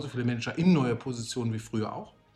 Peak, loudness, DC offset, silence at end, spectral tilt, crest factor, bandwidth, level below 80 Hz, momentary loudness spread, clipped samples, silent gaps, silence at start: -12 dBFS; -29 LUFS; under 0.1%; 0.25 s; -6.5 dB/octave; 18 dB; 12 kHz; -62 dBFS; 10 LU; under 0.1%; none; 0 s